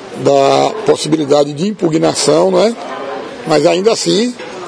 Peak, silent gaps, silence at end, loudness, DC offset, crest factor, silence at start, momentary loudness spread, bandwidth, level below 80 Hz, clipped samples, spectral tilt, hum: 0 dBFS; none; 0 s; -12 LUFS; under 0.1%; 12 dB; 0 s; 12 LU; 10.5 kHz; -56 dBFS; 0.2%; -4.5 dB/octave; none